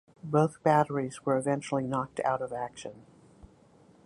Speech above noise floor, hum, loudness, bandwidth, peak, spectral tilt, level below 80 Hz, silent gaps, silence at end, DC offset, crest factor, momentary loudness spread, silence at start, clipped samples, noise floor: 30 dB; none; -29 LUFS; 11.5 kHz; -10 dBFS; -6.5 dB/octave; -66 dBFS; none; 1.05 s; under 0.1%; 20 dB; 12 LU; 0.25 s; under 0.1%; -59 dBFS